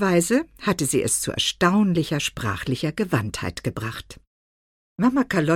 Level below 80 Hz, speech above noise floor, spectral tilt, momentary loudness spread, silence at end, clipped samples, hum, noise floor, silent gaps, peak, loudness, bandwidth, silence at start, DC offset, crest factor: -48 dBFS; over 68 dB; -4.5 dB/octave; 10 LU; 0 s; under 0.1%; none; under -90 dBFS; 4.27-4.96 s; -6 dBFS; -23 LUFS; 17 kHz; 0 s; under 0.1%; 18 dB